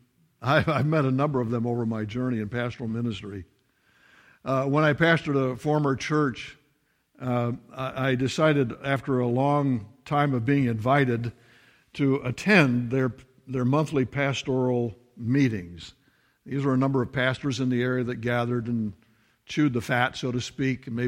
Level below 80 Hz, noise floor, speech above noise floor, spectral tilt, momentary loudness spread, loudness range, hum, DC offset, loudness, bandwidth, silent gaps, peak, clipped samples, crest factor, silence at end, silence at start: -58 dBFS; -69 dBFS; 44 dB; -7 dB/octave; 11 LU; 3 LU; none; under 0.1%; -25 LUFS; 12.5 kHz; none; -6 dBFS; under 0.1%; 20 dB; 0 s; 0.4 s